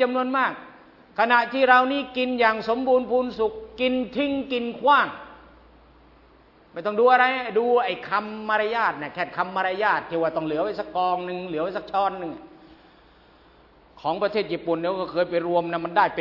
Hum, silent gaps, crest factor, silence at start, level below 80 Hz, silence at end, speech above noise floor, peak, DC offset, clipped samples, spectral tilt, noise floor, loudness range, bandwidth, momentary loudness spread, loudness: none; none; 22 dB; 0 s; -60 dBFS; 0 s; 31 dB; -2 dBFS; under 0.1%; under 0.1%; -6.5 dB/octave; -54 dBFS; 8 LU; 6 kHz; 10 LU; -23 LUFS